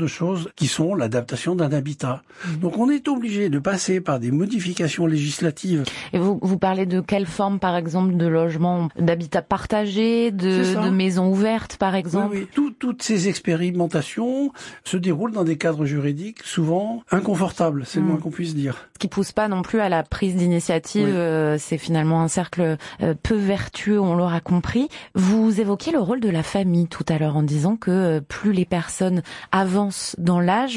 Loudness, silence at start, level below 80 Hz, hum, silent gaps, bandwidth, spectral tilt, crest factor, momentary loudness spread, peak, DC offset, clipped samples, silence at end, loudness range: -22 LUFS; 0 s; -50 dBFS; none; none; 11.5 kHz; -6 dB/octave; 16 dB; 5 LU; -6 dBFS; under 0.1%; under 0.1%; 0 s; 2 LU